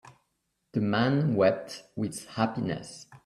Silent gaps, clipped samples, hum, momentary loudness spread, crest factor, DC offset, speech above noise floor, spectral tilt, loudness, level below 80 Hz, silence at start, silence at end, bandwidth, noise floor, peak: none; under 0.1%; none; 12 LU; 20 dB; under 0.1%; 50 dB; -6.5 dB/octave; -28 LUFS; -66 dBFS; 0.05 s; 0.1 s; 13 kHz; -78 dBFS; -10 dBFS